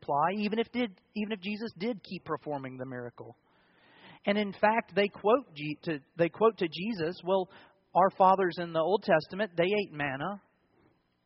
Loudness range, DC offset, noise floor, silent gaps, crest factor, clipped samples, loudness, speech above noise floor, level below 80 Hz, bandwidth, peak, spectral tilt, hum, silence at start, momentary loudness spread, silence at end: 8 LU; under 0.1%; -68 dBFS; none; 20 dB; under 0.1%; -30 LUFS; 38 dB; -72 dBFS; 5.8 kHz; -10 dBFS; -4 dB/octave; none; 0.1 s; 12 LU; 0.85 s